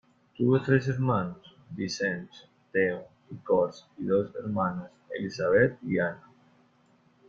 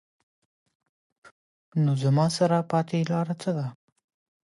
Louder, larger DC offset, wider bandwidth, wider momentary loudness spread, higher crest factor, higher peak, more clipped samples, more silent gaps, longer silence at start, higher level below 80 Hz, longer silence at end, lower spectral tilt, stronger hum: second, -28 LUFS vs -25 LUFS; neither; second, 7.6 kHz vs 11.5 kHz; first, 17 LU vs 9 LU; about the same, 20 dB vs 18 dB; about the same, -8 dBFS vs -10 dBFS; neither; second, none vs 1.31-1.72 s; second, 0.4 s vs 1.25 s; first, -64 dBFS vs -70 dBFS; first, 1.1 s vs 0.75 s; about the same, -7 dB/octave vs -7 dB/octave; neither